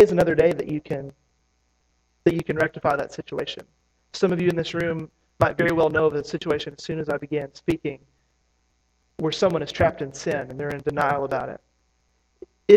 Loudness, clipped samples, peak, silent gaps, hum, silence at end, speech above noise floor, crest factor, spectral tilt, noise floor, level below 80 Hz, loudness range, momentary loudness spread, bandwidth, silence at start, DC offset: -24 LUFS; under 0.1%; -2 dBFS; none; none; 0 s; 44 dB; 22 dB; -6 dB/octave; -68 dBFS; -52 dBFS; 4 LU; 13 LU; 14 kHz; 0 s; under 0.1%